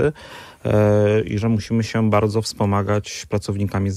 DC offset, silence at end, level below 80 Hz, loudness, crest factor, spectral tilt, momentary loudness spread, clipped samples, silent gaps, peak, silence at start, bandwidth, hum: under 0.1%; 0 s; -46 dBFS; -20 LUFS; 16 dB; -6.5 dB/octave; 9 LU; under 0.1%; none; -4 dBFS; 0 s; 13 kHz; none